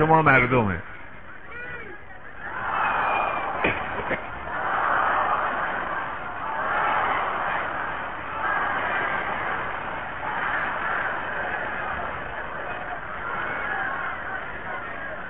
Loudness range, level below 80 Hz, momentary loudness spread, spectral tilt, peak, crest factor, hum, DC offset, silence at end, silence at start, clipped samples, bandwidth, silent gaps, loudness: 4 LU; -48 dBFS; 11 LU; -9.5 dB/octave; -6 dBFS; 20 dB; none; 1%; 0 s; 0 s; under 0.1%; 5 kHz; none; -26 LUFS